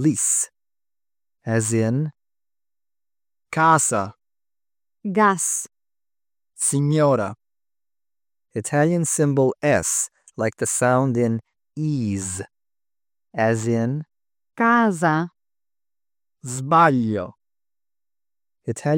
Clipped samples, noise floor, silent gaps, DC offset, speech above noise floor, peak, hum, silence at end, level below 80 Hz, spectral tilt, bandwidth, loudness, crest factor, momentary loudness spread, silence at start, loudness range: under 0.1%; under -90 dBFS; none; under 0.1%; over 70 dB; -4 dBFS; 50 Hz at -50 dBFS; 0 s; -64 dBFS; -5 dB/octave; 17.5 kHz; -21 LUFS; 20 dB; 15 LU; 0 s; 4 LU